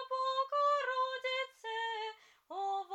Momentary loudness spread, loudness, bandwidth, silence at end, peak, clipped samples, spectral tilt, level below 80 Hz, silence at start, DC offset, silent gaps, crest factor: 10 LU; -35 LUFS; 9.8 kHz; 0 s; -22 dBFS; under 0.1%; 1 dB/octave; under -90 dBFS; 0 s; under 0.1%; none; 14 dB